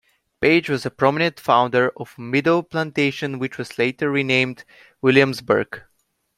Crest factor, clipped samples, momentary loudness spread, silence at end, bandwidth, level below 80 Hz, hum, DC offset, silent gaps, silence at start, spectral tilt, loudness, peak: 20 dB; under 0.1%; 10 LU; 0.6 s; 15 kHz; -60 dBFS; none; under 0.1%; none; 0.4 s; -6 dB/octave; -20 LUFS; -2 dBFS